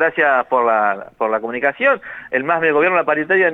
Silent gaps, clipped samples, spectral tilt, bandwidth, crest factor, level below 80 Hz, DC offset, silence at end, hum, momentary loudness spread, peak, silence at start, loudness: none; under 0.1%; -7 dB/octave; 4 kHz; 14 dB; -64 dBFS; under 0.1%; 0 s; none; 7 LU; -2 dBFS; 0 s; -17 LUFS